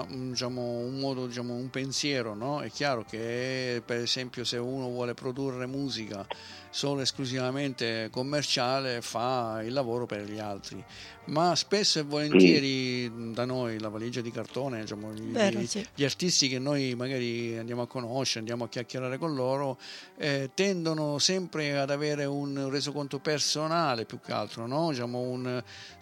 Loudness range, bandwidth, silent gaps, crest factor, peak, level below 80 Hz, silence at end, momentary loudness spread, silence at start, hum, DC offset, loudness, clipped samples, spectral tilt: 6 LU; 17 kHz; none; 24 dB; -6 dBFS; -68 dBFS; 0 s; 10 LU; 0 s; none; under 0.1%; -30 LUFS; under 0.1%; -4 dB/octave